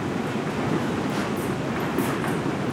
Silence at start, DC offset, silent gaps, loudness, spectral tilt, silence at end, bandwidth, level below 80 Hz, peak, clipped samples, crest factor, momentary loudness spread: 0 s; under 0.1%; none; -26 LUFS; -6 dB/octave; 0 s; 17.5 kHz; -52 dBFS; -12 dBFS; under 0.1%; 14 dB; 2 LU